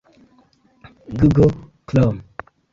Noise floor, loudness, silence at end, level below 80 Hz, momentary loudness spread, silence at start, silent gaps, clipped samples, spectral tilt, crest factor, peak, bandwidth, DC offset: -56 dBFS; -17 LUFS; 0.5 s; -38 dBFS; 22 LU; 1.1 s; none; under 0.1%; -9.5 dB/octave; 18 dB; -2 dBFS; 7.4 kHz; under 0.1%